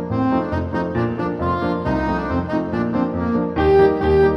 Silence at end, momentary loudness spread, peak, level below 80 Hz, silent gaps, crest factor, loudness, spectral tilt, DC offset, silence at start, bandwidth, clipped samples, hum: 0 s; 8 LU; -4 dBFS; -34 dBFS; none; 14 dB; -19 LUFS; -9 dB/octave; under 0.1%; 0 s; 6.2 kHz; under 0.1%; none